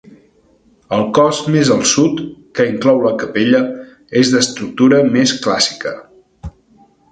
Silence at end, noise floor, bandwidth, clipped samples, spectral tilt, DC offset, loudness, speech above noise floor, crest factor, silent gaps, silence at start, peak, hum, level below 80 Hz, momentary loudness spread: 0.65 s; -52 dBFS; 9.4 kHz; under 0.1%; -4 dB/octave; under 0.1%; -14 LUFS; 39 dB; 16 dB; none; 0.9 s; 0 dBFS; none; -46 dBFS; 16 LU